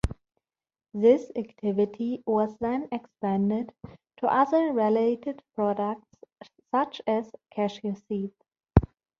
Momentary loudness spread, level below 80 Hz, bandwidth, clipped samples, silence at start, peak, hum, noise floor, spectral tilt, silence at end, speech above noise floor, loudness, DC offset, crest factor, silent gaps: 13 LU; -44 dBFS; 9.2 kHz; under 0.1%; 0.05 s; -2 dBFS; none; -82 dBFS; -8.5 dB/octave; 0.35 s; 55 dB; -27 LUFS; under 0.1%; 26 dB; none